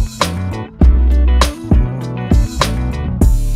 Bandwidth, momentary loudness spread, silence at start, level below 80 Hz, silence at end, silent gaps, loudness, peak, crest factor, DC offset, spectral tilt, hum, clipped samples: 14 kHz; 8 LU; 0 s; -14 dBFS; 0 s; none; -15 LUFS; 0 dBFS; 12 dB; under 0.1%; -6 dB/octave; none; under 0.1%